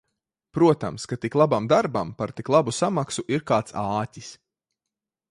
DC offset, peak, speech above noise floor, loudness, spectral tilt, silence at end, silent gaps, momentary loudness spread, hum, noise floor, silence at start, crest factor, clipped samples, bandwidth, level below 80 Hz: under 0.1%; -4 dBFS; 64 dB; -23 LUFS; -6 dB/octave; 0.95 s; none; 11 LU; none; -87 dBFS; 0.55 s; 20 dB; under 0.1%; 11.5 kHz; -58 dBFS